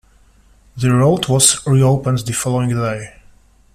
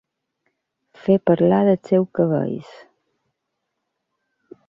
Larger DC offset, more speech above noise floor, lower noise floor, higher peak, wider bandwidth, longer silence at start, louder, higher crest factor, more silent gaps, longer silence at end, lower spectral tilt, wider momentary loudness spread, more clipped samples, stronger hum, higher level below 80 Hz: neither; second, 35 dB vs 60 dB; second, -50 dBFS vs -78 dBFS; first, 0 dBFS vs -4 dBFS; first, 14.5 kHz vs 7.2 kHz; second, 0.75 s vs 1.05 s; first, -15 LUFS vs -19 LUFS; about the same, 16 dB vs 18 dB; neither; second, 0.65 s vs 2.05 s; second, -4.5 dB/octave vs -10 dB/octave; about the same, 10 LU vs 12 LU; neither; neither; first, -44 dBFS vs -62 dBFS